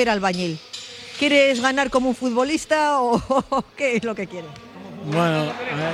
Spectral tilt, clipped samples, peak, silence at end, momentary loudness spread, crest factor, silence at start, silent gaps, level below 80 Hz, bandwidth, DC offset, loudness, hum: -4.5 dB/octave; under 0.1%; -4 dBFS; 0 s; 17 LU; 16 dB; 0 s; none; -52 dBFS; 13 kHz; under 0.1%; -21 LUFS; none